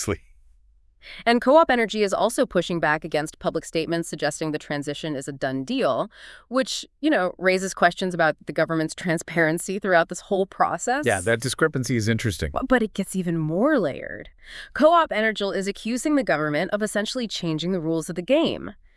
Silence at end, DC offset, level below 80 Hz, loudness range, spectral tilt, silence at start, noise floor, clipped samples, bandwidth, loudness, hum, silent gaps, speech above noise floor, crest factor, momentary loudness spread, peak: 0.25 s; under 0.1%; -50 dBFS; 4 LU; -4.5 dB/octave; 0 s; -57 dBFS; under 0.1%; 12 kHz; -23 LUFS; none; none; 34 dB; 20 dB; 8 LU; -2 dBFS